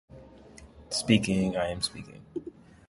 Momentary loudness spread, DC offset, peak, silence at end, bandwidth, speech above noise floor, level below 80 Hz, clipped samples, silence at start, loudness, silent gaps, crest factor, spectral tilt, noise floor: 17 LU; under 0.1%; -8 dBFS; 0.35 s; 11.5 kHz; 23 dB; -54 dBFS; under 0.1%; 0.1 s; -28 LUFS; none; 22 dB; -4.5 dB/octave; -51 dBFS